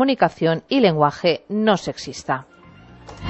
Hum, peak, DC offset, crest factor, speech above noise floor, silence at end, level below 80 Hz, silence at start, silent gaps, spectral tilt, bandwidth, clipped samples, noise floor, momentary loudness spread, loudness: none; -2 dBFS; under 0.1%; 18 dB; 26 dB; 0 s; -52 dBFS; 0 s; none; -6 dB/octave; 8.4 kHz; under 0.1%; -45 dBFS; 10 LU; -20 LUFS